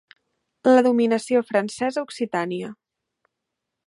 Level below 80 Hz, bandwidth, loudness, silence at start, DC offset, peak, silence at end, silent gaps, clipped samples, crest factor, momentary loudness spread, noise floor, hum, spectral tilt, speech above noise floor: -72 dBFS; 11.5 kHz; -22 LUFS; 0.65 s; under 0.1%; -4 dBFS; 1.15 s; none; under 0.1%; 18 dB; 12 LU; -82 dBFS; none; -5.5 dB/octave; 61 dB